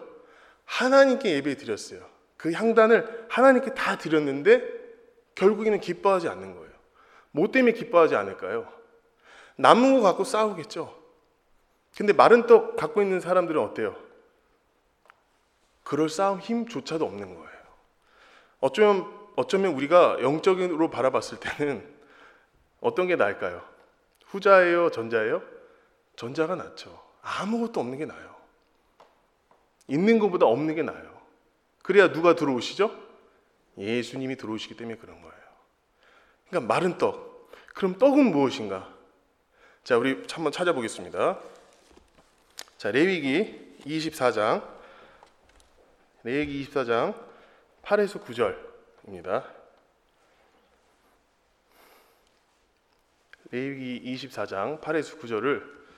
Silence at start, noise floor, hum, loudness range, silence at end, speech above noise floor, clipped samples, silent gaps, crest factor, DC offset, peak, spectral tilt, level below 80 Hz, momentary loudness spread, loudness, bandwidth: 0 s; -68 dBFS; none; 10 LU; 0.25 s; 44 dB; under 0.1%; none; 26 dB; under 0.1%; 0 dBFS; -5.5 dB/octave; -68 dBFS; 19 LU; -24 LUFS; 13 kHz